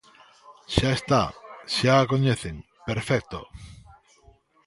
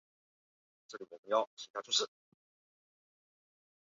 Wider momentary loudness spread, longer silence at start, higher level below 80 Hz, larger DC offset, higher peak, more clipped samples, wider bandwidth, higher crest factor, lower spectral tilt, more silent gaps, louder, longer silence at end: about the same, 19 LU vs 17 LU; second, 0.5 s vs 0.9 s; first, -44 dBFS vs under -90 dBFS; neither; first, -2 dBFS vs -18 dBFS; neither; first, 11.5 kHz vs 7.4 kHz; about the same, 24 dB vs 24 dB; first, -5.5 dB/octave vs 1.5 dB/octave; second, none vs 1.19-1.23 s, 1.47-1.57 s, 1.70-1.74 s; first, -24 LUFS vs -35 LUFS; second, 0.95 s vs 1.9 s